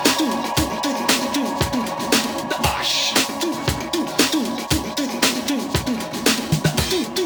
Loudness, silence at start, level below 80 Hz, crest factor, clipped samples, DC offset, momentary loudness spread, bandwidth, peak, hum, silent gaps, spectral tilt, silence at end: -20 LUFS; 0 s; -38 dBFS; 20 dB; under 0.1%; under 0.1%; 5 LU; over 20 kHz; 0 dBFS; none; none; -3 dB/octave; 0 s